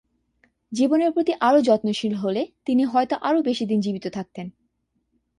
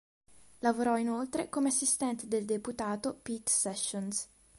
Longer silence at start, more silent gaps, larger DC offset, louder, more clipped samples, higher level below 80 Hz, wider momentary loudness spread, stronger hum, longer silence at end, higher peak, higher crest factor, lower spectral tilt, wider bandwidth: about the same, 0.7 s vs 0.6 s; neither; neither; first, -22 LUFS vs -32 LUFS; neither; about the same, -66 dBFS vs -68 dBFS; first, 14 LU vs 8 LU; neither; first, 0.9 s vs 0.35 s; first, -6 dBFS vs -16 dBFS; about the same, 16 dB vs 16 dB; first, -6 dB/octave vs -3 dB/octave; about the same, 11 kHz vs 12 kHz